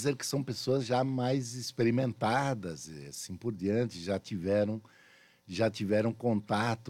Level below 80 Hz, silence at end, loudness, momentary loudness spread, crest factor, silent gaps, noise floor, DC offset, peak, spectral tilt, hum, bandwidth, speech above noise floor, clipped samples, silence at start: -72 dBFS; 0 s; -32 LUFS; 12 LU; 16 dB; none; -61 dBFS; under 0.1%; -16 dBFS; -5.5 dB/octave; none; 16.5 kHz; 30 dB; under 0.1%; 0 s